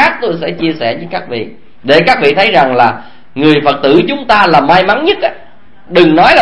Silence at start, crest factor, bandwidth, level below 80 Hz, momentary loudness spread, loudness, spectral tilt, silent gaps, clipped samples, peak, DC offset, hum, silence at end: 0 s; 10 dB; 11 kHz; -42 dBFS; 13 LU; -9 LUFS; -6 dB/octave; none; 1%; 0 dBFS; 3%; none; 0 s